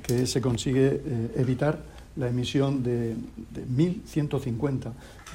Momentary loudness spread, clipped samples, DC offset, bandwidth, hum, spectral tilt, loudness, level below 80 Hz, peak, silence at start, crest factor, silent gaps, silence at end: 12 LU; under 0.1%; under 0.1%; 16 kHz; none; -6.5 dB/octave; -27 LUFS; -48 dBFS; -10 dBFS; 0 s; 16 dB; none; 0 s